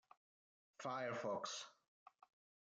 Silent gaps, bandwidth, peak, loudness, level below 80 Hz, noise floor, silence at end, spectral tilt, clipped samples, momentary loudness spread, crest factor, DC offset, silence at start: none; 9.4 kHz; -32 dBFS; -46 LUFS; under -90 dBFS; under -90 dBFS; 0.9 s; -3 dB/octave; under 0.1%; 8 LU; 18 dB; under 0.1%; 0.8 s